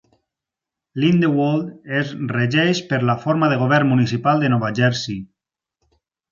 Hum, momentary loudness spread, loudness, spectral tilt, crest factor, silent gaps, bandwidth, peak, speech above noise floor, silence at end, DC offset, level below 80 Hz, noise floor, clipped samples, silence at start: none; 8 LU; -19 LUFS; -6.5 dB/octave; 16 dB; none; 7.4 kHz; -2 dBFS; 68 dB; 1.05 s; under 0.1%; -58 dBFS; -86 dBFS; under 0.1%; 0.95 s